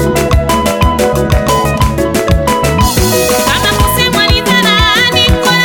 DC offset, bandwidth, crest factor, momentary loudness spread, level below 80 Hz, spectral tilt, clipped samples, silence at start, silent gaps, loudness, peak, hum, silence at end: under 0.1%; 19.5 kHz; 10 dB; 4 LU; -18 dBFS; -4 dB/octave; under 0.1%; 0 s; none; -9 LUFS; 0 dBFS; none; 0 s